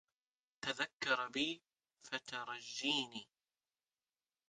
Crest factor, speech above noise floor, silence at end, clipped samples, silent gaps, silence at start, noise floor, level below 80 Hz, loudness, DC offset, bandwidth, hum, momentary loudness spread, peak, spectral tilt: 22 dB; over 49 dB; 1.25 s; under 0.1%; 0.93-1.00 s; 0.65 s; under -90 dBFS; -84 dBFS; -40 LUFS; under 0.1%; 10 kHz; none; 10 LU; -22 dBFS; -2 dB/octave